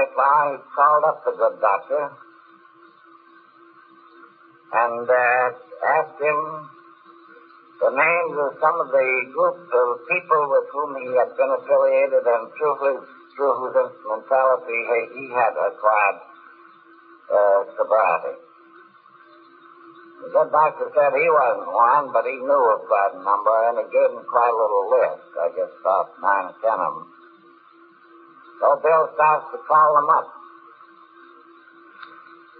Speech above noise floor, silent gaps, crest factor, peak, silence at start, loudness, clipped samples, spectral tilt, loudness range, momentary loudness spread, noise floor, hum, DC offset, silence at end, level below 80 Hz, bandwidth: 31 dB; none; 16 dB; -4 dBFS; 0 s; -20 LUFS; under 0.1%; -9 dB/octave; 5 LU; 8 LU; -51 dBFS; none; under 0.1%; 0.55 s; -88 dBFS; 4.5 kHz